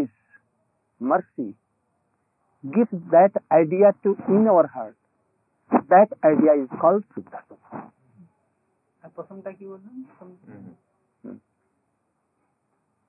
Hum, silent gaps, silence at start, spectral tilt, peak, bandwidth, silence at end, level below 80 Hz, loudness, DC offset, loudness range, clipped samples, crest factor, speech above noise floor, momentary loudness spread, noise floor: none; none; 0 s; -13.5 dB/octave; -4 dBFS; 2.8 kHz; 1.8 s; -80 dBFS; -19 LUFS; under 0.1%; 23 LU; under 0.1%; 20 dB; 52 dB; 24 LU; -73 dBFS